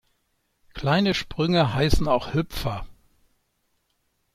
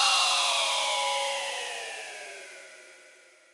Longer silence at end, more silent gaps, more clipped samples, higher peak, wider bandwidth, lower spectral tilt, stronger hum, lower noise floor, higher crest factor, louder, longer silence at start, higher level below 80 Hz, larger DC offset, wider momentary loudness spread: first, 1.45 s vs 0.45 s; neither; neither; first, -4 dBFS vs -12 dBFS; first, 15.5 kHz vs 11.5 kHz; first, -6 dB/octave vs 3.5 dB/octave; neither; first, -72 dBFS vs -56 dBFS; about the same, 22 dB vs 18 dB; about the same, -24 LUFS vs -26 LUFS; first, 0.75 s vs 0 s; first, -38 dBFS vs -88 dBFS; neither; second, 10 LU vs 21 LU